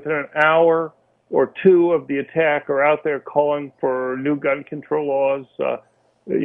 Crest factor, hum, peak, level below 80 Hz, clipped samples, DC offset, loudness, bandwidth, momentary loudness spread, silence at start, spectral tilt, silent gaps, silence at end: 16 dB; none; -2 dBFS; -66 dBFS; under 0.1%; under 0.1%; -19 LUFS; 3.8 kHz; 10 LU; 0 s; -8.5 dB/octave; none; 0 s